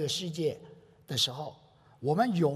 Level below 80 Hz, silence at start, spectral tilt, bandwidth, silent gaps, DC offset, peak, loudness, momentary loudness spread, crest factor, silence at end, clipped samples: -72 dBFS; 0 s; -4.5 dB/octave; 15.5 kHz; none; under 0.1%; -14 dBFS; -31 LUFS; 15 LU; 18 dB; 0 s; under 0.1%